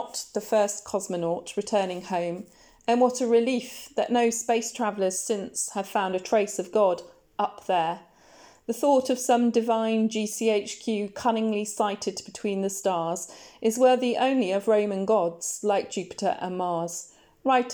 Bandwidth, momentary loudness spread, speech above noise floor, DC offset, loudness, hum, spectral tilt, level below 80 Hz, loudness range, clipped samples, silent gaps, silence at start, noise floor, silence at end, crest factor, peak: over 20 kHz; 9 LU; 28 dB; under 0.1%; -26 LUFS; none; -4 dB/octave; -70 dBFS; 3 LU; under 0.1%; none; 0 s; -54 dBFS; 0 s; 16 dB; -10 dBFS